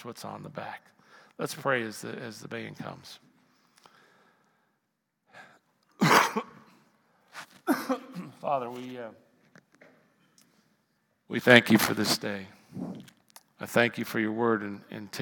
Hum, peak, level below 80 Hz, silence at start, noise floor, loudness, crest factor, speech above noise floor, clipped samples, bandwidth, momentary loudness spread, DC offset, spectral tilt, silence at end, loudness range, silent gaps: none; 0 dBFS; -76 dBFS; 0 s; -80 dBFS; -27 LUFS; 32 dB; 51 dB; under 0.1%; 18 kHz; 23 LU; under 0.1%; -4 dB/octave; 0 s; 14 LU; none